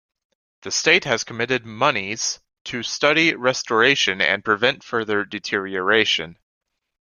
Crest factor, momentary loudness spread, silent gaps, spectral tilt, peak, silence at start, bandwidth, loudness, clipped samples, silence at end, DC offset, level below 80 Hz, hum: 20 dB; 9 LU; 2.61-2.65 s; -2.5 dB/octave; -2 dBFS; 0.65 s; 11 kHz; -19 LUFS; under 0.1%; 0.75 s; under 0.1%; -62 dBFS; none